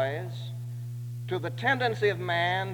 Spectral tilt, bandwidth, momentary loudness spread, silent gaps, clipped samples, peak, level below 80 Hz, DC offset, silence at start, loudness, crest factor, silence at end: -6 dB/octave; 19.5 kHz; 12 LU; none; under 0.1%; -12 dBFS; -64 dBFS; under 0.1%; 0 s; -30 LUFS; 18 dB; 0 s